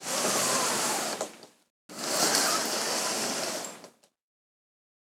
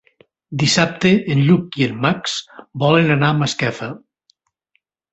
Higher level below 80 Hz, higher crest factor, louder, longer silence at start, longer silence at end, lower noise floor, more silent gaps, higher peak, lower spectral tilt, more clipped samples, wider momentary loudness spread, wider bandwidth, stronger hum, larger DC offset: second, -82 dBFS vs -54 dBFS; first, 24 dB vs 18 dB; second, -27 LUFS vs -17 LUFS; second, 0 s vs 0.5 s; about the same, 1.1 s vs 1.15 s; second, -54 dBFS vs -68 dBFS; first, 1.70-1.89 s vs none; second, -6 dBFS vs -2 dBFS; second, -0.5 dB/octave vs -5 dB/octave; neither; second, 12 LU vs 15 LU; first, 18 kHz vs 8.2 kHz; neither; neither